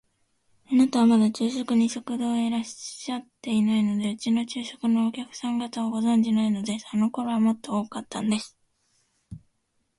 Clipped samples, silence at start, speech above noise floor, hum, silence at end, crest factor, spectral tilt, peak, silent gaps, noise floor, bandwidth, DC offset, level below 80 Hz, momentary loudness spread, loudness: under 0.1%; 0.7 s; 48 dB; none; 0.6 s; 14 dB; -5.5 dB/octave; -10 dBFS; none; -73 dBFS; 11.5 kHz; under 0.1%; -66 dBFS; 11 LU; -25 LUFS